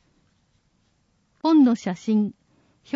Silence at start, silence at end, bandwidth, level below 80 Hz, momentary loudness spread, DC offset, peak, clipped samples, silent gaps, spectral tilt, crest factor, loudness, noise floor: 1.45 s; 0 s; 7.6 kHz; -72 dBFS; 10 LU; under 0.1%; -8 dBFS; under 0.1%; none; -7 dB/octave; 16 dB; -21 LUFS; -67 dBFS